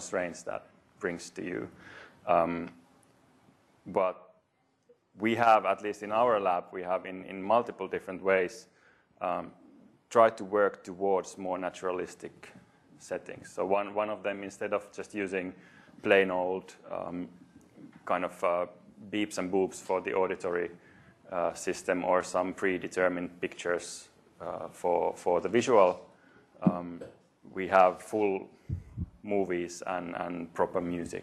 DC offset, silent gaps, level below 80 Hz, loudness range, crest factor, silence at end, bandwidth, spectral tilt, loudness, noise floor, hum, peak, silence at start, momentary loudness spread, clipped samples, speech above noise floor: under 0.1%; none; -66 dBFS; 6 LU; 24 dB; 0 s; 13 kHz; -5 dB/octave; -31 LUFS; -73 dBFS; none; -8 dBFS; 0 s; 16 LU; under 0.1%; 42 dB